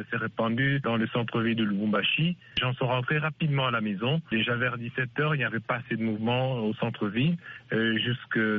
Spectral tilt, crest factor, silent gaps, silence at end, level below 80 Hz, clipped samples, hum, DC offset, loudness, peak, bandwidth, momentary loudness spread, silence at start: -4 dB/octave; 14 dB; none; 0 s; -62 dBFS; under 0.1%; none; under 0.1%; -27 LUFS; -14 dBFS; 5.2 kHz; 5 LU; 0 s